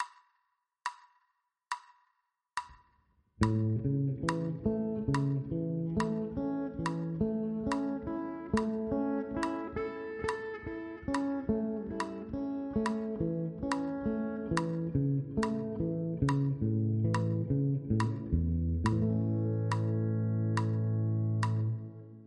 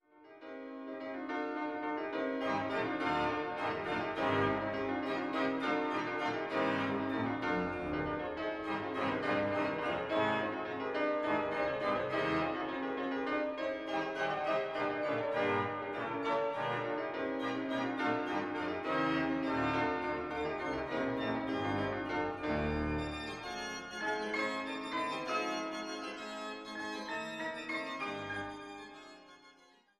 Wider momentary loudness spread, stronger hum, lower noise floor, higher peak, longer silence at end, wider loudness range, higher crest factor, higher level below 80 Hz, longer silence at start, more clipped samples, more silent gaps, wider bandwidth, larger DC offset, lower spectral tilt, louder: about the same, 8 LU vs 8 LU; neither; first, -80 dBFS vs -64 dBFS; first, -12 dBFS vs -20 dBFS; second, 0 s vs 0.5 s; about the same, 4 LU vs 4 LU; about the same, 20 dB vs 16 dB; first, -50 dBFS vs -58 dBFS; second, 0 s vs 0.15 s; neither; neither; about the same, 10.5 kHz vs 11.5 kHz; neither; first, -8 dB/octave vs -5.5 dB/octave; first, -33 LUFS vs -36 LUFS